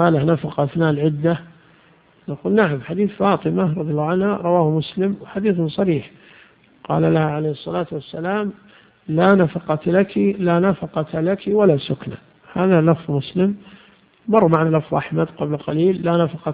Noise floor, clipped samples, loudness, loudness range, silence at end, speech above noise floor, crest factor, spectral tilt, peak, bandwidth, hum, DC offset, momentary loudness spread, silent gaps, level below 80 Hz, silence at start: -53 dBFS; under 0.1%; -19 LUFS; 3 LU; 0 s; 35 dB; 18 dB; -11 dB/octave; 0 dBFS; 4.9 kHz; none; under 0.1%; 10 LU; none; -54 dBFS; 0 s